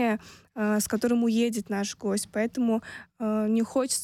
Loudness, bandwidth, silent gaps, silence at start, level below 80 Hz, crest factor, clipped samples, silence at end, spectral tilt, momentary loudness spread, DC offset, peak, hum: -27 LUFS; 16.5 kHz; none; 0 s; -64 dBFS; 14 dB; under 0.1%; 0 s; -4.5 dB/octave; 8 LU; under 0.1%; -14 dBFS; none